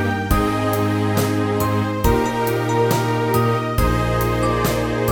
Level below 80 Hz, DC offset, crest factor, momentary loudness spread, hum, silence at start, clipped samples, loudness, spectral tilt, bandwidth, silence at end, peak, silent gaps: -30 dBFS; under 0.1%; 16 dB; 2 LU; none; 0 s; under 0.1%; -19 LUFS; -6 dB/octave; 17.5 kHz; 0 s; -4 dBFS; none